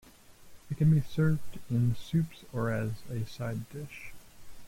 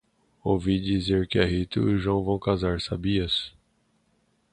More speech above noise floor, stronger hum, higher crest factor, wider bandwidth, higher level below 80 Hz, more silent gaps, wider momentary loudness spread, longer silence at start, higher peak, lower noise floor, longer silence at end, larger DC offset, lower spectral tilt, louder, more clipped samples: second, 23 dB vs 44 dB; neither; about the same, 16 dB vs 20 dB; first, 16 kHz vs 10 kHz; second, -54 dBFS vs -42 dBFS; neither; first, 16 LU vs 4 LU; second, 0.05 s vs 0.45 s; second, -16 dBFS vs -6 dBFS; second, -53 dBFS vs -68 dBFS; second, 0 s vs 1.05 s; neither; about the same, -8 dB/octave vs -7 dB/octave; second, -31 LUFS vs -26 LUFS; neither